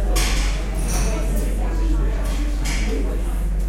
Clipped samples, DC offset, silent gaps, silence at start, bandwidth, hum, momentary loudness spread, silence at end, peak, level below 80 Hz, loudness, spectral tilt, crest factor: under 0.1%; under 0.1%; none; 0 s; 15.5 kHz; none; 4 LU; 0 s; -8 dBFS; -20 dBFS; -23 LUFS; -4.5 dB/octave; 12 dB